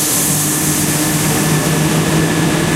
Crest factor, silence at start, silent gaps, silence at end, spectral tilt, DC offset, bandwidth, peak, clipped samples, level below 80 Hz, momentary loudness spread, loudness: 12 dB; 0 s; none; 0 s; -3.5 dB/octave; under 0.1%; 16 kHz; -2 dBFS; under 0.1%; -36 dBFS; 1 LU; -13 LUFS